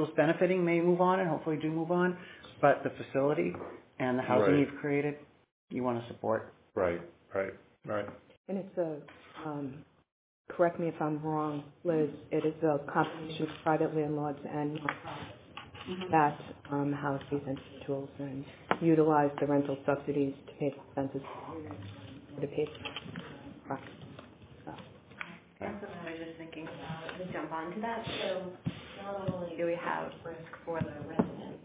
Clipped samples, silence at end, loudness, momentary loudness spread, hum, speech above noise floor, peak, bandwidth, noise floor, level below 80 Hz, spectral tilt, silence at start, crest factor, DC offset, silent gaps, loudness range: under 0.1%; 0.05 s; -33 LUFS; 17 LU; none; 20 dB; -8 dBFS; 4 kHz; -53 dBFS; -64 dBFS; -5.5 dB/octave; 0 s; 24 dB; under 0.1%; 5.51-5.68 s, 8.37-8.44 s, 10.12-10.45 s; 11 LU